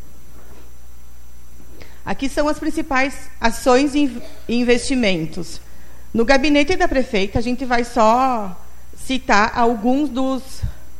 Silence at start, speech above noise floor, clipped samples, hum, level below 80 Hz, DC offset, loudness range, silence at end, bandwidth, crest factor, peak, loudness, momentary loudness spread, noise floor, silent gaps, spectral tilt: 0.35 s; 26 dB; under 0.1%; none; -34 dBFS; 5%; 4 LU; 0.1 s; 16 kHz; 18 dB; 0 dBFS; -18 LUFS; 15 LU; -43 dBFS; none; -4.5 dB/octave